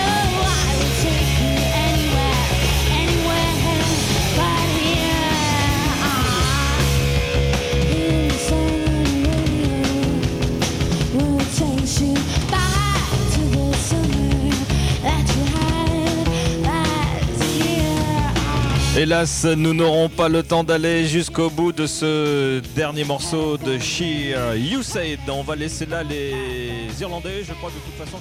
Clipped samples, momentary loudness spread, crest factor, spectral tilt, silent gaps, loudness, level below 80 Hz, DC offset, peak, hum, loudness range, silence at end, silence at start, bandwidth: under 0.1%; 7 LU; 14 dB; -4.5 dB/octave; none; -19 LUFS; -26 dBFS; under 0.1%; -4 dBFS; none; 4 LU; 0 s; 0 s; 16 kHz